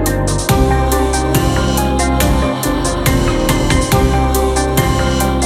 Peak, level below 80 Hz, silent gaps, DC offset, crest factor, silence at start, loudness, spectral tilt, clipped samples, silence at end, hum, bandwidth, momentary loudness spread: 0 dBFS; -18 dBFS; none; under 0.1%; 12 dB; 0 s; -14 LUFS; -5 dB/octave; under 0.1%; 0 s; none; 16.5 kHz; 2 LU